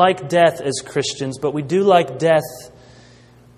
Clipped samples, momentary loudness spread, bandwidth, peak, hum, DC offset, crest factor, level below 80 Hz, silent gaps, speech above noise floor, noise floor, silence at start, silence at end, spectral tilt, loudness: under 0.1%; 9 LU; 15 kHz; 0 dBFS; 60 Hz at -50 dBFS; under 0.1%; 18 dB; -56 dBFS; none; 30 dB; -47 dBFS; 0 s; 0.9 s; -4.5 dB/octave; -18 LUFS